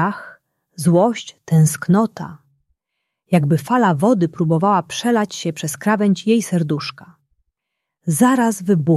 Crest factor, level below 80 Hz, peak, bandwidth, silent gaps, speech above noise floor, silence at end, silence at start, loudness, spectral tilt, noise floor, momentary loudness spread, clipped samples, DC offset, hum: 16 dB; -60 dBFS; -2 dBFS; 14.5 kHz; none; 63 dB; 0 s; 0 s; -17 LUFS; -6 dB/octave; -80 dBFS; 9 LU; under 0.1%; under 0.1%; none